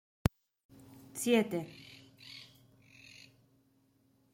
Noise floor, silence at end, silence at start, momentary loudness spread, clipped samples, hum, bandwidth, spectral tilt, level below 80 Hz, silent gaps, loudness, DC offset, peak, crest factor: -71 dBFS; 1.9 s; 0.95 s; 26 LU; under 0.1%; none; 16.5 kHz; -5 dB/octave; -54 dBFS; none; -34 LUFS; under 0.1%; -10 dBFS; 28 dB